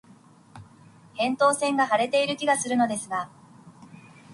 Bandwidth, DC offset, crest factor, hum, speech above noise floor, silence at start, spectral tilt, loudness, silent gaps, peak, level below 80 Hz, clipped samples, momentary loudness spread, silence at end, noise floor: 11.5 kHz; under 0.1%; 18 dB; none; 30 dB; 0.55 s; -3 dB/octave; -24 LUFS; none; -10 dBFS; -70 dBFS; under 0.1%; 10 LU; 0 s; -53 dBFS